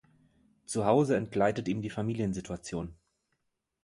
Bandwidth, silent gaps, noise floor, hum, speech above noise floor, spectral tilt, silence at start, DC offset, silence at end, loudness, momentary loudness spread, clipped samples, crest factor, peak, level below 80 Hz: 11.5 kHz; none; -80 dBFS; none; 51 dB; -6.5 dB/octave; 0.7 s; under 0.1%; 0.9 s; -31 LUFS; 12 LU; under 0.1%; 22 dB; -10 dBFS; -58 dBFS